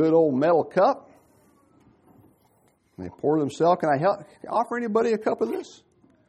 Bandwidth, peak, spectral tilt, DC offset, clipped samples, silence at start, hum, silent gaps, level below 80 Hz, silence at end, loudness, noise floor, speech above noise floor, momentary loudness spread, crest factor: 10.5 kHz; -8 dBFS; -7 dB/octave; under 0.1%; under 0.1%; 0 s; none; none; -70 dBFS; 0.6 s; -24 LUFS; -64 dBFS; 41 dB; 13 LU; 16 dB